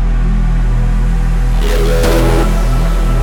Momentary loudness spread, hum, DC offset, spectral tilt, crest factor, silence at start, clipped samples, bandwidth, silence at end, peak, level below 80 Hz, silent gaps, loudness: 4 LU; none; under 0.1%; -6 dB/octave; 10 dB; 0 s; under 0.1%; 15.5 kHz; 0 s; 0 dBFS; -12 dBFS; none; -14 LUFS